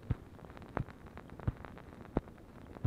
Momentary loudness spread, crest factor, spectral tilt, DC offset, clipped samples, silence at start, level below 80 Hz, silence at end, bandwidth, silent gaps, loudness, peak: 12 LU; 28 dB; -9 dB/octave; under 0.1%; under 0.1%; 0 s; -50 dBFS; 0 s; 15 kHz; none; -44 LUFS; -14 dBFS